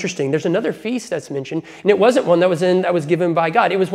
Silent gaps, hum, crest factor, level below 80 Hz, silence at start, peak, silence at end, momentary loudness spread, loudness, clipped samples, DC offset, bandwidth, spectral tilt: none; none; 16 dB; -64 dBFS; 0 s; 0 dBFS; 0 s; 11 LU; -17 LUFS; under 0.1%; under 0.1%; 13 kHz; -6 dB/octave